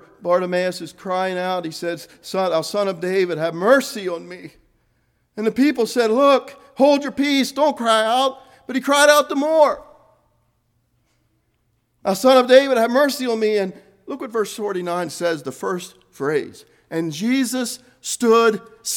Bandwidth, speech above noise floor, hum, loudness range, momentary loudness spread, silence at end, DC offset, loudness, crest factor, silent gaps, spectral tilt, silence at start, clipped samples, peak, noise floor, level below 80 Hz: 18 kHz; 48 dB; none; 7 LU; 14 LU; 0 s; under 0.1%; -19 LUFS; 20 dB; none; -3.5 dB/octave; 0.2 s; under 0.1%; 0 dBFS; -67 dBFS; -66 dBFS